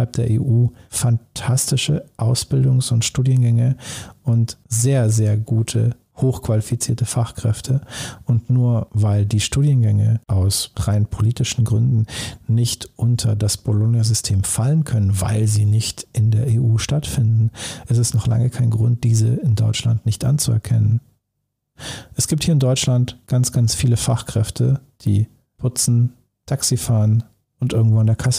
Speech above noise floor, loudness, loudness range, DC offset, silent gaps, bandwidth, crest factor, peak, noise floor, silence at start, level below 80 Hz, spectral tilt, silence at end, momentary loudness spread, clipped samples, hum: 58 dB; -19 LUFS; 2 LU; under 0.1%; none; 15.5 kHz; 10 dB; -8 dBFS; -75 dBFS; 0 s; -42 dBFS; -5.5 dB/octave; 0 s; 6 LU; under 0.1%; none